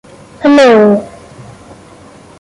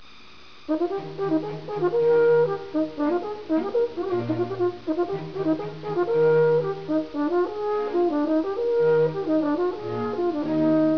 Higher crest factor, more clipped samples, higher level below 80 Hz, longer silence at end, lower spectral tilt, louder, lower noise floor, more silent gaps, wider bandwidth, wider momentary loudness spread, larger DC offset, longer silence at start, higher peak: about the same, 10 dB vs 12 dB; neither; first, -48 dBFS vs -62 dBFS; first, 1.35 s vs 0 s; second, -6 dB/octave vs -9 dB/octave; first, -8 LUFS vs -24 LUFS; second, -37 dBFS vs -49 dBFS; neither; first, 11.5 kHz vs 5.4 kHz; first, 12 LU vs 8 LU; second, under 0.1% vs 0.5%; second, 0.4 s vs 0.7 s; first, -2 dBFS vs -12 dBFS